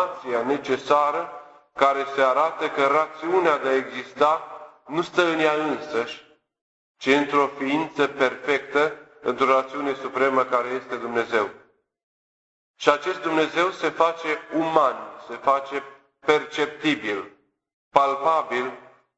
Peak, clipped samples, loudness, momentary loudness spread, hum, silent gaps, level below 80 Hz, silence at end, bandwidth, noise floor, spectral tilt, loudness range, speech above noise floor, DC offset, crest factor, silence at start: -2 dBFS; under 0.1%; -23 LUFS; 10 LU; none; 6.61-6.95 s, 12.03-12.74 s, 17.73-17.91 s; -68 dBFS; 0.35 s; 8.2 kHz; under -90 dBFS; -4.5 dB/octave; 3 LU; over 67 dB; under 0.1%; 22 dB; 0 s